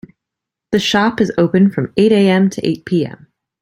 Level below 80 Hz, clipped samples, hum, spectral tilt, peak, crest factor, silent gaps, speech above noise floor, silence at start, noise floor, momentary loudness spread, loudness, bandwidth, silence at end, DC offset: -52 dBFS; under 0.1%; none; -6 dB/octave; 0 dBFS; 14 dB; none; 69 dB; 0.7 s; -82 dBFS; 8 LU; -14 LUFS; 11.5 kHz; 0.5 s; under 0.1%